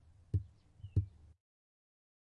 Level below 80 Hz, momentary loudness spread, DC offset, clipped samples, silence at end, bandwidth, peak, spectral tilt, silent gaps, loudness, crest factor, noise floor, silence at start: -56 dBFS; 18 LU; under 0.1%; under 0.1%; 1.25 s; 3.1 kHz; -22 dBFS; -10.5 dB/octave; none; -41 LUFS; 22 dB; -56 dBFS; 0.35 s